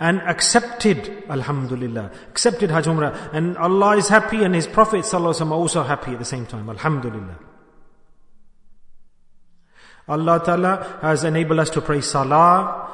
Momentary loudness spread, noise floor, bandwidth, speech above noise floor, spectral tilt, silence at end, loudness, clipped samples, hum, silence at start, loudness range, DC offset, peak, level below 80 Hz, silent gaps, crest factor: 12 LU; -48 dBFS; 11 kHz; 29 dB; -4.5 dB/octave; 0 s; -19 LUFS; under 0.1%; none; 0 s; 12 LU; under 0.1%; 0 dBFS; -48 dBFS; none; 20 dB